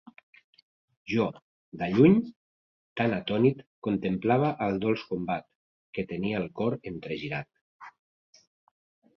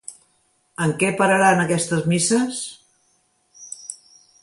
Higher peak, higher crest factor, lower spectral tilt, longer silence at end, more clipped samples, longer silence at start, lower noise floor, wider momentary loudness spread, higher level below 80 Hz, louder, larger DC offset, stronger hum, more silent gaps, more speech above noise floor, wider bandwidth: second, -8 dBFS vs -4 dBFS; about the same, 22 dB vs 18 dB; first, -8.5 dB/octave vs -4.5 dB/octave; first, 1.3 s vs 0.45 s; neither; first, 1.05 s vs 0.1 s; first, under -90 dBFS vs -64 dBFS; second, 15 LU vs 21 LU; about the same, -62 dBFS vs -62 dBFS; second, -28 LUFS vs -19 LUFS; neither; neither; first, 1.42-1.72 s, 2.36-2.96 s, 3.67-3.82 s, 5.55-5.93 s, 7.61-7.80 s vs none; first, over 63 dB vs 46 dB; second, 6.4 kHz vs 11.5 kHz